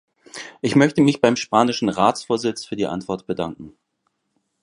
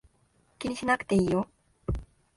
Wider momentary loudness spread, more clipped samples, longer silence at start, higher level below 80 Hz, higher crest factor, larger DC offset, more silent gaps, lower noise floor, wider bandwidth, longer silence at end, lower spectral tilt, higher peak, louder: first, 16 LU vs 13 LU; neither; second, 0.35 s vs 0.6 s; second, -58 dBFS vs -44 dBFS; about the same, 20 dB vs 20 dB; neither; neither; first, -72 dBFS vs -67 dBFS; about the same, 11 kHz vs 11.5 kHz; first, 0.95 s vs 0.3 s; about the same, -5.5 dB/octave vs -6 dB/octave; first, 0 dBFS vs -12 dBFS; first, -20 LUFS vs -29 LUFS